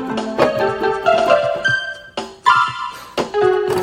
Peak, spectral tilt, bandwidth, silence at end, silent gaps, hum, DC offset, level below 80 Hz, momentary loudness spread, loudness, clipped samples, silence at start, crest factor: 0 dBFS; -4.5 dB/octave; 16 kHz; 0 s; none; none; under 0.1%; -52 dBFS; 12 LU; -17 LUFS; under 0.1%; 0 s; 16 dB